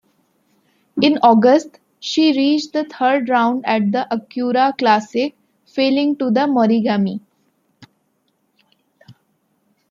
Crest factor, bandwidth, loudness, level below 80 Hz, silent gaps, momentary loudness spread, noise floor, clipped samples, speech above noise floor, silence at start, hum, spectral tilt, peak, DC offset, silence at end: 16 dB; 7.6 kHz; -16 LUFS; -68 dBFS; none; 11 LU; -66 dBFS; under 0.1%; 50 dB; 0.95 s; none; -5.5 dB/octave; -2 dBFS; under 0.1%; 0.8 s